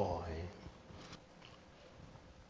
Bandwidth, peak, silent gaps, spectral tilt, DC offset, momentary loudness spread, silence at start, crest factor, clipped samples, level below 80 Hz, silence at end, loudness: 8 kHz; -22 dBFS; none; -6.5 dB/octave; under 0.1%; 15 LU; 0 s; 26 dB; under 0.1%; -56 dBFS; 0 s; -49 LUFS